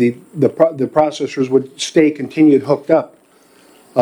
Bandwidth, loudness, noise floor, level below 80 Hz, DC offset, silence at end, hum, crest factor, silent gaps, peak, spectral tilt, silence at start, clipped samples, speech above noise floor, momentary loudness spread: 11.5 kHz; -15 LUFS; -50 dBFS; -62 dBFS; under 0.1%; 0 s; none; 16 dB; none; 0 dBFS; -6 dB/octave; 0 s; under 0.1%; 35 dB; 6 LU